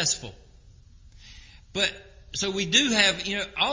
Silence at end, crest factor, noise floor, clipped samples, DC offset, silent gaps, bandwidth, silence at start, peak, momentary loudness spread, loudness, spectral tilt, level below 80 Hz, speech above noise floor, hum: 0 s; 22 dB; -52 dBFS; under 0.1%; under 0.1%; none; 7.8 kHz; 0 s; -6 dBFS; 15 LU; -24 LUFS; -1.5 dB/octave; -52 dBFS; 26 dB; none